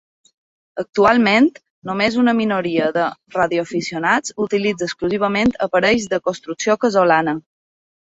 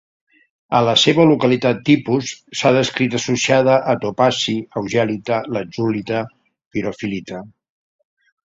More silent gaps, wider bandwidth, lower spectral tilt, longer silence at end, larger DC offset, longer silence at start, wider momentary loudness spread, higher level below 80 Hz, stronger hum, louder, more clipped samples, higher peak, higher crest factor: first, 0.89-0.93 s, 1.70-1.82 s vs 6.66-6.71 s; about the same, 8 kHz vs 7.8 kHz; about the same, -4.5 dB/octave vs -5 dB/octave; second, 0.7 s vs 1.05 s; neither; about the same, 0.75 s vs 0.7 s; about the same, 10 LU vs 12 LU; about the same, -54 dBFS vs -56 dBFS; neither; about the same, -18 LUFS vs -17 LUFS; neither; about the same, -2 dBFS vs 0 dBFS; about the same, 16 dB vs 18 dB